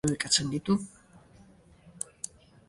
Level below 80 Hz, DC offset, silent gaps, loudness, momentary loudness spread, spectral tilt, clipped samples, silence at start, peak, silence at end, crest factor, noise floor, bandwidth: -60 dBFS; under 0.1%; none; -29 LUFS; 16 LU; -3.5 dB/octave; under 0.1%; 0.05 s; -12 dBFS; 0.4 s; 22 dB; -57 dBFS; 11.5 kHz